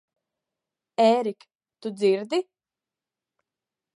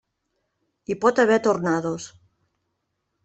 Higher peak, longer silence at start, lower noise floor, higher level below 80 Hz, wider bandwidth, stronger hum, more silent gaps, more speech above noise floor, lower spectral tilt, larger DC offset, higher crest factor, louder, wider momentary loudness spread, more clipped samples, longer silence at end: second, -8 dBFS vs -4 dBFS; about the same, 1 s vs 0.9 s; first, under -90 dBFS vs -77 dBFS; second, -86 dBFS vs -66 dBFS; first, 11.5 kHz vs 8.4 kHz; neither; first, 1.55-1.59 s vs none; first, over 67 dB vs 56 dB; about the same, -5.5 dB/octave vs -5.5 dB/octave; neither; about the same, 20 dB vs 20 dB; second, -24 LUFS vs -21 LUFS; second, 16 LU vs 19 LU; neither; first, 1.55 s vs 1.15 s